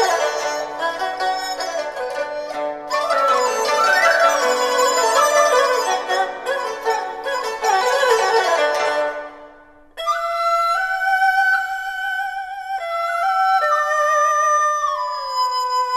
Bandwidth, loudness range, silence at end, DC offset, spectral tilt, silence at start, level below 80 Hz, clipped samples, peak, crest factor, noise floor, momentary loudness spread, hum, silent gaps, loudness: 14 kHz; 4 LU; 0 s; under 0.1%; 0.5 dB/octave; 0 s; -58 dBFS; under 0.1%; -2 dBFS; 16 dB; -46 dBFS; 10 LU; none; none; -18 LUFS